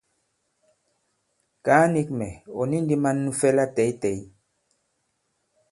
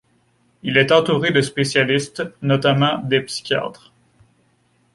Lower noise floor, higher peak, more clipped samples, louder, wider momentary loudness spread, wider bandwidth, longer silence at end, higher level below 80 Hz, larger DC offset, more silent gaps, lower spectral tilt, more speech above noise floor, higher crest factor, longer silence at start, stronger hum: first, -74 dBFS vs -61 dBFS; about the same, -2 dBFS vs -2 dBFS; neither; second, -23 LUFS vs -18 LUFS; about the same, 12 LU vs 10 LU; about the same, 11.5 kHz vs 11.5 kHz; first, 1.45 s vs 1.2 s; about the same, -58 dBFS vs -58 dBFS; neither; neither; first, -6.5 dB/octave vs -5 dB/octave; first, 51 dB vs 43 dB; first, 24 dB vs 18 dB; first, 1.65 s vs 0.65 s; neither